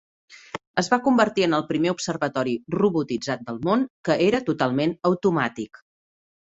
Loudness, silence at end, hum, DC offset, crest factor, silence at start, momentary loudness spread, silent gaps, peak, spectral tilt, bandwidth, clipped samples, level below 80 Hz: -23 LUFS; 0.85 s; none; under 0.1%; 20 dB; 0.3 s; 8 LU; 0.67-0.74 s, 3.90-4.04 s; -2 dBFS; -5.5 dB/octave; 8.2 kHz; under 0.1%; -62 dBFS